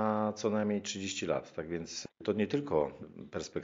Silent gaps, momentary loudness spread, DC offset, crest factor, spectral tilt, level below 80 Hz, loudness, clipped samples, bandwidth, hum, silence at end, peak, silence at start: none; 10 LU; under 0.1%; 18 dB; -5 dB/octave; -64 dBFS; -35 LUFS; under 0.1%; 7.4 kHz; none; 0 s; -16 dBFS; 0 s